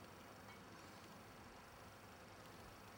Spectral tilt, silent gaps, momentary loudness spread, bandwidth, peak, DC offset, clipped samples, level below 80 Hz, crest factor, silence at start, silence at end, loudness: -4 dB/octave; none; 1 LU; 19 kHz; -44 dBFS; under 0.1%; under 0.1%; -74 dBFS; 14 dB; 0 s; 0 s; -59 LUFS